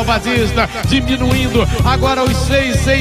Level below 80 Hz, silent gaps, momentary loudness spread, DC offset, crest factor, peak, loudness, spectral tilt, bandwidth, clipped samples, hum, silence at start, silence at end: -22 dBFS; none; 1 LU; under 0.1%; 12 dB; -2 dBFS; -14 LUFS; -5 dB/octave; 15.5 kHz; under 0.1%; none; 0 s; 0 s